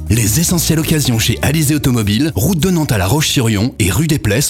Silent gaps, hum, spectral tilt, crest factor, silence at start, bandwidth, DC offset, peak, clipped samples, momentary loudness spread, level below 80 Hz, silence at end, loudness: none; none; -4.5 dB/octave; 12 dB; 0 s; 17.5 kHz; under 0.1%; 0 dBFS; under 0.1%; 2 LU; -30 dBFS; 0 s; -13 LUFS